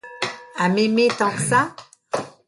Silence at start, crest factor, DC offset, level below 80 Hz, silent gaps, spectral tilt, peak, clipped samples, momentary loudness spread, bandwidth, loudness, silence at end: 0.05 s; 16 dB; under 0.1%; -62 dBFS; none; -4.5 dB/octave; -4 dBFS; under 0.1%; 11 LU; 11.5 kHz; -21 LUFS; 0.2 s